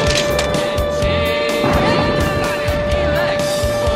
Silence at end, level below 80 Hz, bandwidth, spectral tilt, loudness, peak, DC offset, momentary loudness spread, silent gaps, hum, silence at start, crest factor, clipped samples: 0 s; -28 dBFS; 16 kHz; -4.5 dB/octave; -17 LUFS; -2 dBFS; under 0.1%; 3 LU; none; none; 0 s; 14 dB; under 0.1%